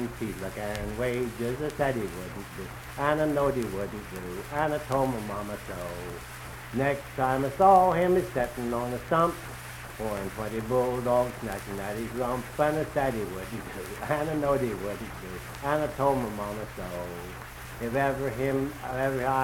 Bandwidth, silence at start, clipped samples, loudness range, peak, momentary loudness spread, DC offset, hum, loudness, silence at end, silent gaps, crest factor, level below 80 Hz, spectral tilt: 18 kHz; 0 s; under 0.1%; 6 LU; -8 dBFS; 13 LU; under 0.1%; none; -29 LUFS; 0 s; none; 22 dB; -48 dBFS; -6 dB/octave